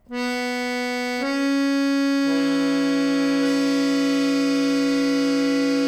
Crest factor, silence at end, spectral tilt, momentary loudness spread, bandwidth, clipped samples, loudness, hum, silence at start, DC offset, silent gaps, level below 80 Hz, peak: 10 dB; 0 s; -4 dB/octave; 4 LU; 14 kHz; under 0.1%; -21 LUFS; none; 0.1 s; under 0.1%; none; -60 dBFS; -12 dBFS